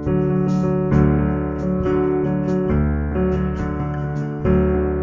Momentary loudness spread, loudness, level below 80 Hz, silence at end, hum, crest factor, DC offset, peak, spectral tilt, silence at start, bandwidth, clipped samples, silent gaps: 7 LU; -20 LUFS; -28 dBFS; 0 s; none; 14 dB; under 0.1%; -4 dBFS; -10 dB/octave; 0 s; 7.2 kHz; under 0.1%; none